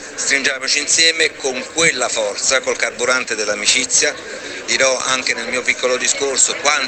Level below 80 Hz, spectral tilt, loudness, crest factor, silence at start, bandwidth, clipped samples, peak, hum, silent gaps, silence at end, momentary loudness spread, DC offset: -58 dBFS; 0.5 dB/octave; -15 LUFS; 16 dB; 0 s; 9.6 kHz; under 0.1%; 0 dBFS; none; none; 0 s; 7 LU; under 0.1%